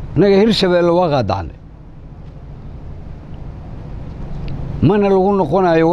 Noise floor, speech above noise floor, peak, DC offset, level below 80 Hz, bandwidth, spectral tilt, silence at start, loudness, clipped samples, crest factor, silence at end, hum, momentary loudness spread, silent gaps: -35 dBFS; 23 dB; -2 dBFS; under 0.1%; -32 dBFS; 11.5 kHz; -7.5 dB/octave; 0 s; -14 LUFS; under 0.1%; 14 dB; 0 s; none; 22 LU; none